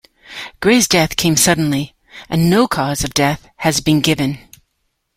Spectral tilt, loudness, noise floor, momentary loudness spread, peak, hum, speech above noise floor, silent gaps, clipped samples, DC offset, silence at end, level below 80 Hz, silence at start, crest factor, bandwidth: -4 dB/octave; -15 LUFS; -69 dBFS; 16 LU; 0 dBFS; none; 54 dB; none; under 0.1%; under 0.1%; 0.8 s; -42 dBFS; 0.3 s; 16 dB; 16.5 kHz